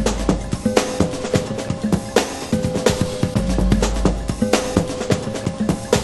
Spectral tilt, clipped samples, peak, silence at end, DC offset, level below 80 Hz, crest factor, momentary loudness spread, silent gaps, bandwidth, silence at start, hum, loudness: -5.5 dB/octave; under 0.1%; 0 dBFS; 0 s; under 0.1%; -28 dBFS; 20 dB; 4 LU; none; 12.5 kHz; 0 s; none; -20 LUFS